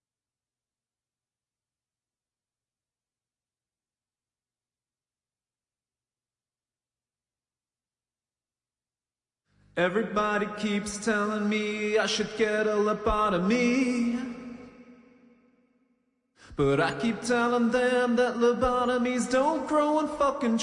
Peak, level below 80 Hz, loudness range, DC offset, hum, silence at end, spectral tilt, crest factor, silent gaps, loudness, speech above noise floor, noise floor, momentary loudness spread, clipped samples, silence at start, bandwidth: -14 dBFS; -54 dBFS; 7 LU; under 0.1%; none; 0 s; -5 dB/octave; 16 dB; none; -26 LUFS; over 64 dB; under -90 dBFS; 6 LU; under 0.1%; 9.75 s; 11.5 kHz